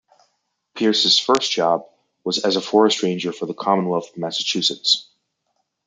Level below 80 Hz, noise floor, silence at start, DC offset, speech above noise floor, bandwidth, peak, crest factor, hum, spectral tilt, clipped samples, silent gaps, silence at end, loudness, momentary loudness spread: -72 dBFS; -73 dBFS; 0.75 s; under 0.1%; 53 dB; 9.4 kHz; -2 dBFS; 20 dB; none; -3.5 dB/octave; under 0.1%; none; 0.85 s; -19 LUFS; 10 LU